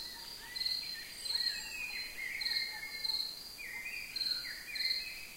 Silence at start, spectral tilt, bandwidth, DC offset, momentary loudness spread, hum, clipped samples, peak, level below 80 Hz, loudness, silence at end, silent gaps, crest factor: 0 s; 1 dB/octave; 16 kHz; under 0.1%; 8 LU; none; under 0.1%; -22 dBFS; -64 dBFS; -36 LUFS; 0 s; none; 18 dB